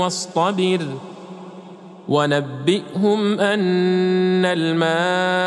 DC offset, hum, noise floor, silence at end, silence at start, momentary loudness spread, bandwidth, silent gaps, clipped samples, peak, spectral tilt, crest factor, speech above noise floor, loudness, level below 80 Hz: under 0.1%; none; -39 dBFS; 0 s; 0 s; 19 LU; 11 kHz; none; under 0.1%; -4 dBFS; -5.5 dB/octave; 14 dB; 21 dB; -19 LUFS; -74 dBFS